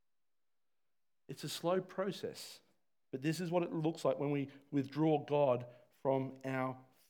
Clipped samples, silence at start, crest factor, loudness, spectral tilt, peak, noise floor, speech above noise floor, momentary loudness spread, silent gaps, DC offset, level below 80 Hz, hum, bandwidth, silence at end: under 0.1%; 1.3 s; 18 dB; -37 LUFS; -6.5 dB/octave; -20 dBFS; under -90 dBFS; over 54 dB; 14 LU; none; under 0.1%; under -90 dBFS; none; 19.5 kHz; 0.25 s